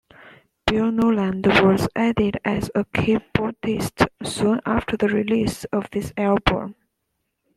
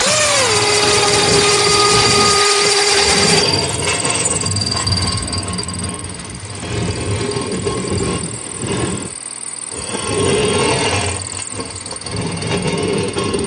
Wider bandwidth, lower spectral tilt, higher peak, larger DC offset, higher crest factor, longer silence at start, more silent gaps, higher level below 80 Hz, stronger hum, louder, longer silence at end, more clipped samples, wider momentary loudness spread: first, 14 kHz vs 11.5 kHz; first, -6 dB/octave vs -2.5 dB/octave; about the same, -2 dBFS vs 0 dBFS; neither; about the same, 20 dB vs 16 dB; first, 0.25 s vs 0 s; neither; about the same, -42 dBFS vs -40 dBFS; neither; second, -21 LUFS vs -15 LUFS; first, 0.85 s vs 0 s; neither; second, 7 LU vs 13 LU